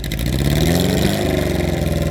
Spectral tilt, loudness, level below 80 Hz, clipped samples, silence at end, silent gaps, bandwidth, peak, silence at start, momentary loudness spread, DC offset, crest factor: -5.5 dB/octave; -18 LUFS; -26 dBFS; under 0.1%; 0 s; none; over 20 kHz; -2 dBFS; 0 s; 4 LU; under 0.1%; 14 dB